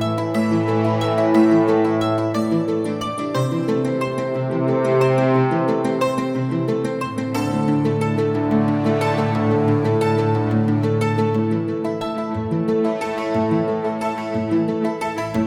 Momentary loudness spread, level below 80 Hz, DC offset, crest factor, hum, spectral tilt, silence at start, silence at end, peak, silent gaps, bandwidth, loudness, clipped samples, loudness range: 7 LU; -54 dBFS; under 0.1%; 16 dB; none; -7.5 dB/octave; 0 s; 0 s; -4 dBFS; none; 14.5 kHz; -20 LUFS; under 0.1%; 3 LU